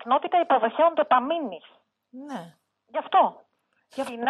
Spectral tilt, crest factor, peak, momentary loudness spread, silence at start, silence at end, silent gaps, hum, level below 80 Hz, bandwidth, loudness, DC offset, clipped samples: -5 dB/octave; 16 dB; -8 dBFS; 18 LU; 0 s; 0 s; none; none; -82 dBFS; 12 kHz; -23 LUFS; under 0.1%; under 0.1%